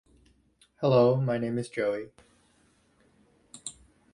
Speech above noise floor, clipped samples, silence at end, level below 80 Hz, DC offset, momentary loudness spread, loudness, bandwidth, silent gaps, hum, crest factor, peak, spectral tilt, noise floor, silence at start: 40 dB; under 0.1%; 0.45 s; -64 dBFS; under 0.1%; 20 LU; -27 LUFS; 11.5 kHz; none; none; 20 dB; -10 dBFS; -6.5 dB/octave; -66 dBFS; 0.8 s